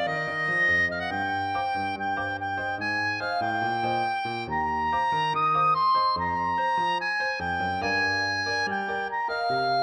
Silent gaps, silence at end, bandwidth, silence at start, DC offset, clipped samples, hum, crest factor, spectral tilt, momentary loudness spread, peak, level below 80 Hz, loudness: none; 0 s; 10.5 kHz; 0 s; under 0.1%; under 0.1%; none; 12 dB; -4.5 dB/octave; 7 LU; -14 dBFS; -56 dBFS; -26 LUFS